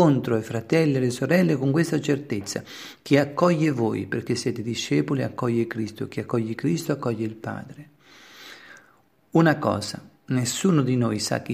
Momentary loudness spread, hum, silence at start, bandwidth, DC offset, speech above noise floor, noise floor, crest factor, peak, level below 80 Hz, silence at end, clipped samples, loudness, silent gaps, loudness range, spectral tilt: 14 LU; none; 0 s; 15.5 kHz; under 0.1%; 37 dB; -60 dBFS; 20 dB; -4 dBFS; -64 dBFS; 0 s; under 0.1%; -24 LUFS; none; 6 LU; -6 dB/octave